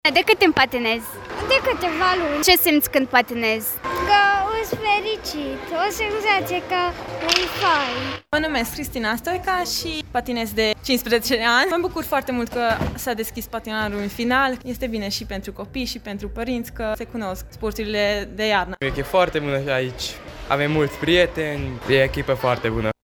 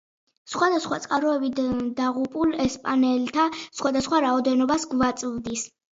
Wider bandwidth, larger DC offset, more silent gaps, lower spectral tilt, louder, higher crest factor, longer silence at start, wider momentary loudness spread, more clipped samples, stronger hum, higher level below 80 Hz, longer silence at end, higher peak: first, 17.5 kHz vs 7.8 kHz; neither; neither; about the same, -3.5 dB/octave vs -4 dB/octave; first, -21 LUFS vs -24 LUFS; first, 22 dB vs 16 dB; second, 0.05 s vs 0.45 s; first, 11 LU vs 7 LU; neither; neither; first, -40 dBFS vs -54 dBFS; second, 0.1 s vs 0.25 s; first, 0 dBFS vs -8 dBFS